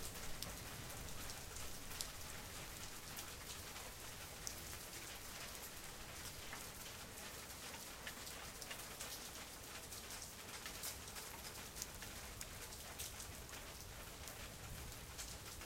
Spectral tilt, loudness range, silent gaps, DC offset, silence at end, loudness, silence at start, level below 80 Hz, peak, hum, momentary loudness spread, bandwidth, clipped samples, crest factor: -2 dB/octave; 1 LU; none; under 0.1%; 0 s; -50 LUFS; 0 s; -60 dBFS; -22 dBFS; none; 3 LU; 16.5 kHz; under 0.1%; 28 dB